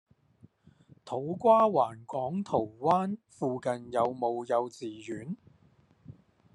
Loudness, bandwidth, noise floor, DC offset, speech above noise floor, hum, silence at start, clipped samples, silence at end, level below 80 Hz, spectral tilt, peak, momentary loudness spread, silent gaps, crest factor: -30 LUFS; 11 kHz; -64 dBFS; under 0.1%; 35 dB; none; 1.05 s; under 0.1%; 0.45 s; -72 dBFS; -7 dB/octave; -12 dBFS; 16 LU; none; 20 dB